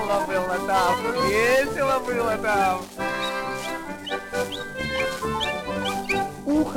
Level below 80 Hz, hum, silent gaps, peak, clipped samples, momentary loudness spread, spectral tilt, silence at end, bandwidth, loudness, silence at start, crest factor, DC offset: -48 dBFS; none; none; -8 dBFS; under 0.1%; 9 LU; -4 dB/octave; 0 s; 18 kHz; -24 LUFS; 0 s; 16 dB; under 0.1%